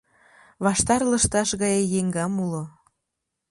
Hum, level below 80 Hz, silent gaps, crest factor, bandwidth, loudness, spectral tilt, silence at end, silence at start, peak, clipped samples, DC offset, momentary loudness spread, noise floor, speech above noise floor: none; -46 dBFS; none; 18 dB; 11.5 kHz; -23 LUFS; -4 dB/octave; 0.8 s; 0.6 s; -6 dBFS; under 0.1%; under 0.1%; 9 LU; -82 dBFS; 59 dB